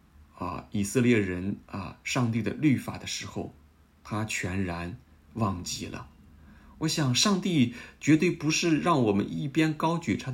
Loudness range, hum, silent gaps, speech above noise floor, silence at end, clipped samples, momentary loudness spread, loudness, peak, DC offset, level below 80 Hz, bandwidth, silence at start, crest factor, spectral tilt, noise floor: 8 LU; none; none; 26 dB; 0 s; under 0.1%; 14 LU; -28 LUFS; -10 dBFS; under 0.1%; -56 dBFS; 16 kHz; 0.35 s; 18 dB; -5 dB/octave; -53 dBFS